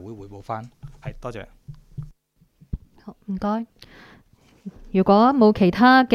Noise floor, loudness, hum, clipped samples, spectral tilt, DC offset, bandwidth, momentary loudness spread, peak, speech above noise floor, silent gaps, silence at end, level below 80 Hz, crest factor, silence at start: -61 dBFS; -19 LUFS; none; under 0.1%; -7.5 dB/octave; under 0.1%; 13 kHz; 26 LU; -4 dBFS; 42 dB; none; 0 s; -44 dBFS; 18 dB; 0.05 s